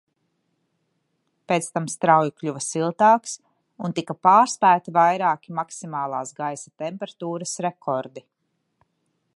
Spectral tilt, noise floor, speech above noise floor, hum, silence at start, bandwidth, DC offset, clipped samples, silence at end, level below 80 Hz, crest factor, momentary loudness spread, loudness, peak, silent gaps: -4.5 dB/octave; -73 dBFS; 51 dB; none; 1.5 s; 11.5 kHz; under 0.1%; under 0.1%; 1.15 s; -76 dBFS; 20 dB; 14 LU; -22 LUFS; -2 dBFS; none